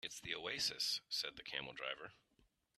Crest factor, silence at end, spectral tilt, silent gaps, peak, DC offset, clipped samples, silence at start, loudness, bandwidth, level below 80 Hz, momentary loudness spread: 20 dB; 0.65 s; -0.5 dB/octave; none; -26 dBFS; under 0.1%; under 0.1%; 0.05 s; -42 LUFS; 15.5 kHz; -76 dBFS; 8 LU